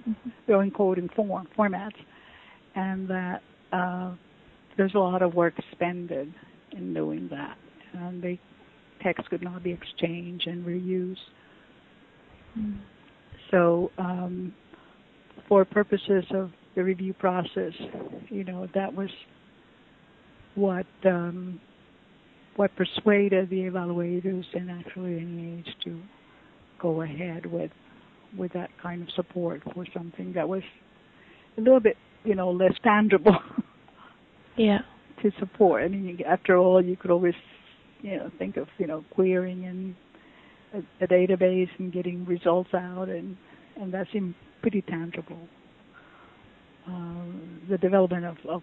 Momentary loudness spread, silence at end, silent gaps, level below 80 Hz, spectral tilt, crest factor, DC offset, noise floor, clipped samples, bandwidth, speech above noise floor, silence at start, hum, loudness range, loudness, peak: 17 LU; 0 s; none; -62 dBFS; -10 dB/octave; 22 dB; under 0.1%; -56 dBFS; under 0.1%; 4.2 kHz; 30 dB; 0.05 s; none; 10 LU; -27 LUFS; -6 dBFS